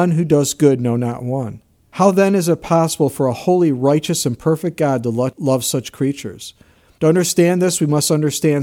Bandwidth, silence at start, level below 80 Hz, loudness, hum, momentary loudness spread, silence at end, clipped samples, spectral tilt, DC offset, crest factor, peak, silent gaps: 17.5 kHz; 0 s; -54 dBFS; -17 LUFS; none; 9 LU; 0 s; under 0.1%; -5.5 dB/octave; under 0.1%; 16 dB; 0 dBFS; none